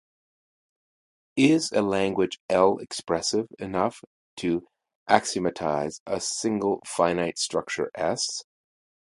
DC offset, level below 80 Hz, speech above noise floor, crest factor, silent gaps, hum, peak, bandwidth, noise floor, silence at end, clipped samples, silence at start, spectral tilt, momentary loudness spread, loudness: under 0.1%; -60 dBFS; over 65 dB; 26 dB; 2.40-2.49 s, 4.07-4.37 s, 4.95-5.06 s, 6.00-6.06 s; none; 0 dBFS; 11.5 kHz; under -90 dBFS; 0.65 s; under 0.1%; 1.35 s; -4 dB/octave; 9 LU; -26 LUFS